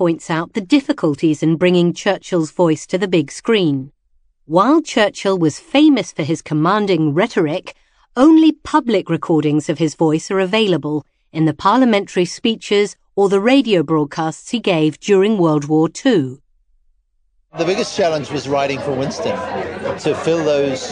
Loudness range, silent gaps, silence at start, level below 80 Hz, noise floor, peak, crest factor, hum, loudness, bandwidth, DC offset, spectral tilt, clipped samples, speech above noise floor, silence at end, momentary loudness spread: 4 LU; none; 0 s; -56 dBFS; -61 dBFS; 0 dBFS; 16 dB; none; -16 LUFS; 10 kHz; under 0.1%; -6 dB/octave; under 0.1%; 45 dB; 0 s; 8 LU